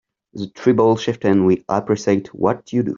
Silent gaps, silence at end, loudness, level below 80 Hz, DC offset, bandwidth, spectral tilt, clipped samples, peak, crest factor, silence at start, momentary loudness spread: none; 0 s; -18 LUFS; -56 dBFS; under 0.1%; 7.6 kHz; -7 dB/octave; under 0.1%; -2 dBFS; 16 dB; 0.35 s; 6 LU